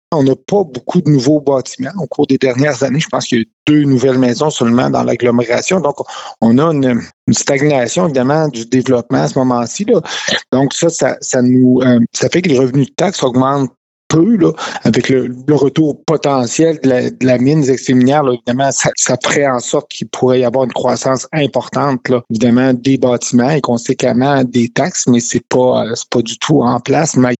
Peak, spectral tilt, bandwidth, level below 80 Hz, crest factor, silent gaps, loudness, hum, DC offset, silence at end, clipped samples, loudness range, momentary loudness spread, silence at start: -2 dBFS; -5 dB/octave; 8.2 kHz; -52 dBFS; 12 dB; 3.53-3.66 s, 7.13-7.27 s, 13.77-14.10 s; -13 LUFS; none; under 0.1%; 0.05 s; under 0.1%; 2 LU; 5 LU; 0.1 s